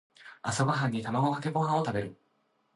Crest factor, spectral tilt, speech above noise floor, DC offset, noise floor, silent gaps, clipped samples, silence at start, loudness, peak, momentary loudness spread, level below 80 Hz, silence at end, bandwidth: 18 dB; -6 dB/octave; 44 dB; under 0.1%; -73 dBFS; none; under 0.1%; 0.2 s; -30 LUFS; -14 dBFS; 8 LU; -64 dBFS; 0.6 s; 11.5 kHz